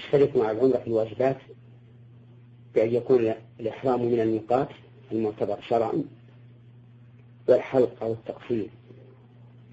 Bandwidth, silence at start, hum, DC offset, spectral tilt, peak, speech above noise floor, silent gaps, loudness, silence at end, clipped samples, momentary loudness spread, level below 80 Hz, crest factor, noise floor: 7.8 kHz; 0 s; none; under 0.1%; -8.5 dB/octave; -6 dBFS; 26 dB; none; -26 LUFS; 0.8 s; under 0.1%; 11 LU; -64 dBFS; 20 dB; -51 dBFS